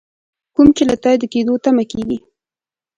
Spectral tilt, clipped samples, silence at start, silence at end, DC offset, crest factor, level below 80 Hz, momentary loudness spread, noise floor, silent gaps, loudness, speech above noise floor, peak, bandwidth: -5.5 dB/octave; under 0.1%; 0.6 s; 0.8 s; under 0.1%; 16 dB; -44 dBFS; 12 LU; under -90 dBFS; none; -15 LUFS; over 76 dB; 0 dBFS; 10.5 kHz